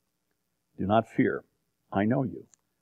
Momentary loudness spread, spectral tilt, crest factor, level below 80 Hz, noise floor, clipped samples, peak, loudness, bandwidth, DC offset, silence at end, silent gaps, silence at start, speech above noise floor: 11 LU; -8.5 dB/octave; 20 dB; -66 dBFS; -79 dBFS; under 0.1%; -10 dBFS; -29 LUFS; 8.6 kHz; under 0.1%; 0.4 s; none; 0.8 s; 52 dB